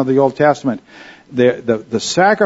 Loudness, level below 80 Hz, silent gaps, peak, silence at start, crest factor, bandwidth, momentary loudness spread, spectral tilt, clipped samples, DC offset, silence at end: -16 LUFS; -56 dBFS; none; 0 dBFS; 0 s; 14 dB; 8 kHz; 10 LU; -5 dB/octave; under 0.1%; under 0.1%; 0 s